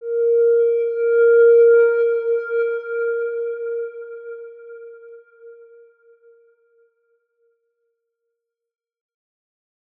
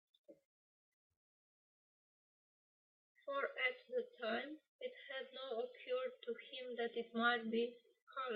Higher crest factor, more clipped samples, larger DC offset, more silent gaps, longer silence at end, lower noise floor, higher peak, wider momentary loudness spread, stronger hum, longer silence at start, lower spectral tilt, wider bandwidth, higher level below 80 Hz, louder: second, 14 dB vs 22 dB; neither; neither; second, none vs 0.45-1.10 s, 1.17-3.15 s, 4.68-4.79 s, 8.02-8.07 s; first, 4.45 s vs 0 s; second, -80 dBFS vs under -90 dBFS; first, -6 dBFS vs -22 dBFS; first, 24 LU vs 13 LU; neither; second, 0 s vs 0.3 s; first, -4.5 dB/octave vs -0.5 dB/octave; second, 3.5 kHz vs 5.2 kHz; about the same, under -90 dBFS vs under -90 dBFS; first, -17 LUFS vs -43 LUFS